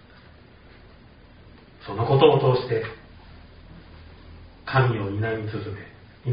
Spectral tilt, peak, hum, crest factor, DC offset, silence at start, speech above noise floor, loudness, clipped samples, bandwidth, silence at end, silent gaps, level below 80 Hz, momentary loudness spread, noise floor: -5.5 dB/octave; -2 dBFS; none; 24 dB; under 0.1%; 1.45 s; 28 dB; -23 LUFS; under 0.1%; 5.2 kHz; 0 s; none; -52 dBFS; 25 LU; -49 dBFS